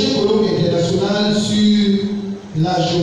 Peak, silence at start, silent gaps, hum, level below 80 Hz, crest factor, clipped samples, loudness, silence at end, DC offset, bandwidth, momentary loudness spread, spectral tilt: -4 dBFS; 0 s; none; none; -48 dBFS; 12 dB; under 0.1%; -16 LUFS; 0 s; under 0.1%; 10 kHz; 8 LU; -6 dB/octave